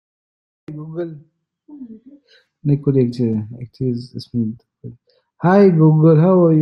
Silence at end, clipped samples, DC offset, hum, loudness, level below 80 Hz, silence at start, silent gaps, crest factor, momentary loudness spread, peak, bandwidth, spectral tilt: 0 s; under 0.1%; under 0.1%; none; -16 LUFS; -58 dBFS; 0.7 s; none; 16 dB; 23 LU; -2 dBFS; 5.8 kHz; -10.5 dB/octave